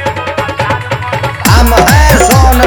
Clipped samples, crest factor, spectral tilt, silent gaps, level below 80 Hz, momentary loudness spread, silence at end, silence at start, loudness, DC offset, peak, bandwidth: 2%; 8 dB; -4.5 dB/octave; none; -14 dBFS; 9 LU; 0 s; 0 s; -8 LUFS; under 0.1%; 0 dBFS; over 20 kHz